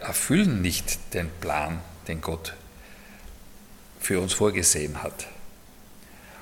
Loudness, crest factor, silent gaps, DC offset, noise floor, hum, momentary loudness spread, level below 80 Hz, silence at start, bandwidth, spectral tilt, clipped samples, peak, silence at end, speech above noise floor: -26 LUFS; 22 dB; none; under 0.1%; -48 dBFS; none; 26 LU; -46 dBFS; 0 s; 17.5 kHz; -3.5 dB/octave; under 0.1%; -6 dBFS; 0 s; 22 dB